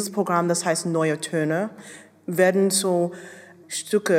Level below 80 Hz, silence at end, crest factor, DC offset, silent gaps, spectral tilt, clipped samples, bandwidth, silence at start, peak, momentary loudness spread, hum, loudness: -82 dBFS; 0 s; 18 dB; under 0.1%; none; -4.5 dB/octave; under 0.1%; 16 kHz; 0 s; -6 dBFS; 19 LU; none; -23 LUFS